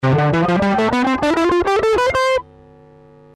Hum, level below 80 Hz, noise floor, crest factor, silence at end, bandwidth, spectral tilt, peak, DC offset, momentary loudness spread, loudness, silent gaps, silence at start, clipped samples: none; -42 dBFS; -45 dBFS; 8 dB; 0.95 s; 13 kHz; -6.5 dB/octave; -10 dBFS; under 0.1%; 2 LU; -16 LUFS; none; 0 s; under 0.1%